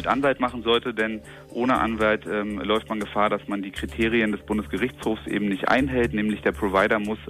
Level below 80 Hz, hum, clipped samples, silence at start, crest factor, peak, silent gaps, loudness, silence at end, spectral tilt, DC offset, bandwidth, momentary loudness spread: -44 dBFS; none; under 0.1%; 0 s; 16 dB; -8 dBFS; none; -24 LUFS; 0 s; -6 dB/octave; under 0.1%; 15 kHz; 7 LU